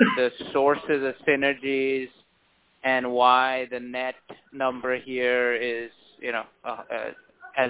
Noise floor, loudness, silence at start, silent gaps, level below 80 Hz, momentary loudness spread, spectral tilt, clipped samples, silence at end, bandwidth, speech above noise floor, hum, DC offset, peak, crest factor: -65 dBFS; -25 LUFS; 0 s; none; -68 dBFS; 15 LU; -8 dB/octave; under 0.1%; 0 s; 4 kHz; 40 dB; none; under 0.1%; -4 dBFS; 22 dB